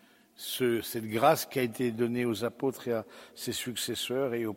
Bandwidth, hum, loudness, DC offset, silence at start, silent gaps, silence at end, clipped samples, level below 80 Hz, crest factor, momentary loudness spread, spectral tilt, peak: 16.5 kHz; none; -31 LUFS; under 0.1%; 0.4 s; none; 0 s; under 0.1%; -70 dBFS; 20 dB; 10 LU; -4.5 dB/octave; -10 dBFS